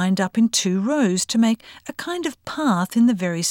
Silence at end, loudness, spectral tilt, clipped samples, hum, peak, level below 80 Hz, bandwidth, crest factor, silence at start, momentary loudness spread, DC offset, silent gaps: 0 s; -20 LUFS; -4.5 dB/octave; under 0.1%; none; -8 dBFS; -64 dBFS; 16.5 kHz; 12 dB; 0 s; 9 LU; under 0.1%; none